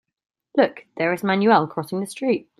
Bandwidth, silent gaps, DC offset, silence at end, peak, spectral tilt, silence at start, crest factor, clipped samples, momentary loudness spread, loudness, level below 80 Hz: 14 kHz; none; under 0.1%; 0.2 s; -2 dBFS; -6 dB/octave; 0.55 s; 20 dB; under 0.1%; 10 LU; -21 LUFS; -70 dBFS